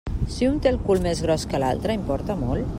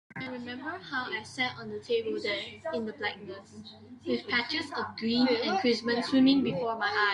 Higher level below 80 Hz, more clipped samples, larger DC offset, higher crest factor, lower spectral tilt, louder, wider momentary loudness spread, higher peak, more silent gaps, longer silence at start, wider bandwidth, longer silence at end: first, -34 dBFS vs -72 dBFS; neither; neither; about the same, 16 dB vs 18 dB; first, -6.5 dB/octave vs -4.5 dB/octave; first, -24 LUFS vs -30 LUFS; second, 5 LU vs 16 LU; first, -8 dBFS vs -12 dBFS; neither; about the same, 0.05 s vs 0.1 s; first, 16 kHz vs 10.5 kHz; about the same, 0 s vs 0 s